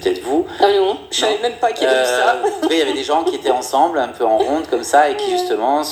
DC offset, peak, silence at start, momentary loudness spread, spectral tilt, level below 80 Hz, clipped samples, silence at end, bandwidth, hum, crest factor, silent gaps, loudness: under 0.1%; 0 dBFS; 0 s; 5 LU; -2.5 dB/octave; -54 dBFS; under 0.1%; 0 s; 19.5 kHz; none; 16 dB; none; -16 LUFS